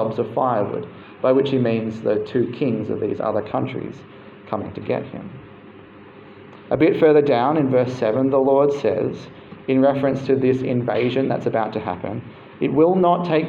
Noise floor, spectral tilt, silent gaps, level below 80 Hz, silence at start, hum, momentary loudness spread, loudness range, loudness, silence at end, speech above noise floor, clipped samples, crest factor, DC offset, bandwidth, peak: -43 dBFS; -8.5 dB/octave; none; -60 dBFS; 0 s; none; 16 LU; 9 LU; -20 LUFS; 0 s; 23 dB; under 0.1%; 16 dB; under 0.1%; 7.2 kHz; -4 dBFS